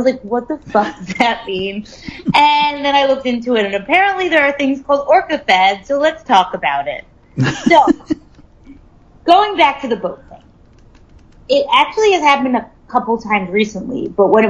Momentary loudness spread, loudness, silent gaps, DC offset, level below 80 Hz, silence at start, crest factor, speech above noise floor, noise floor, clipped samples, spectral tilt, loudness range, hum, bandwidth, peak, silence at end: 11 LU; -14 LUFS; none; under 0.1%; -46 dBFS; 0 s; 16 dB; 31 dB; -45 dBFS; under 0.1%; -5 dB/octave; 3 LU; none; 11 kHz; 0 dBFS; 0 s